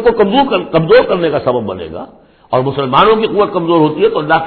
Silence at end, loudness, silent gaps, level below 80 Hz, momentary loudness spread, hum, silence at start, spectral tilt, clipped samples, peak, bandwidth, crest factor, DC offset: 0 s; -12 LUFS; none; -42 dBFS; 10 LU; none; 0 s; -9.5 dB/octave; under 0.1%; 0 dBFS; 5.4 kHz; 12 dB; under 0.1%